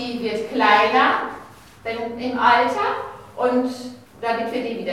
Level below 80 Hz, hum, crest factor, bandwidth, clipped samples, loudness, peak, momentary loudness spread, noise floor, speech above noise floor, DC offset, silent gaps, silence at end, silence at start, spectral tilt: -60 dBFS; none; 18 dB; 15 kHz; under 0.1%; -20 LUFS; -2 dBFS; 17 LU; -42 dBFS; 22 dB; 0.1%; none; 0 s; 0 s; -4.5 dB/octave